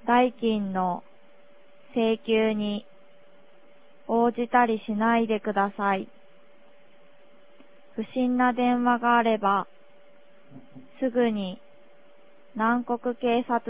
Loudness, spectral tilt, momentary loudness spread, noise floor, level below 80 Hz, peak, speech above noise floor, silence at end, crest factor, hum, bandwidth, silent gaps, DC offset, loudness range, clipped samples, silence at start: -25 LUFS; -9.5 dB/octave; 14 LU; -58 dBFS; -64 dBFS; -6 dBFS; 33 dB; 0 s; 20 dB; none; 4 kHz; none; 0.4%; 4 LU; under 0.1%; 0.05 s